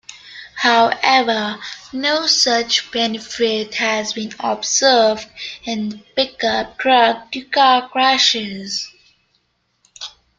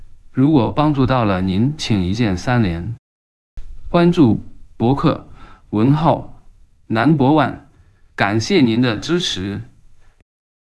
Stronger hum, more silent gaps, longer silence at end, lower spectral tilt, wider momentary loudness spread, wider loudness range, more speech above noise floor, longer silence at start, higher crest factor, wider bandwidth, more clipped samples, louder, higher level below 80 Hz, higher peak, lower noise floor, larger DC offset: neither; second, none vs 2.99-3.57 s; second, 0.3 s vs 0.85 s; second, -1.5 dB/octave vs -6.5 dB/octave; about the same, 15 LU vs 13 LU; about the same, 2 LU vs 2 LU; first, 48 dB vs 34 dB; about the same, 0.1 s vs 0 s; about the same, 18 dB vs 18 dB; second, 9.4 kHz vs 12 kHz; neither; about the same, -16 LUFS vs -17 LUFS; second, -58 dBFS vs -38 dBFS; about the same, 0 dBFS vs 0 dBFS; first, -65 dBFS vs -49 dBFS; neither